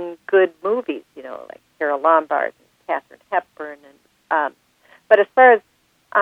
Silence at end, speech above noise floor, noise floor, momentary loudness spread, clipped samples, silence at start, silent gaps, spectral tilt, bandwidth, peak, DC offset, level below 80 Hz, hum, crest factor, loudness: 0 s; 43 dB; -62 dBFS; 22 LU; under 0.1%; 0 s; none; -5.5 dB/octave; 5.6 kHz; 0 dBFS; under 0.1%; -74 dBFS; none; 20 dB; -18 LUFS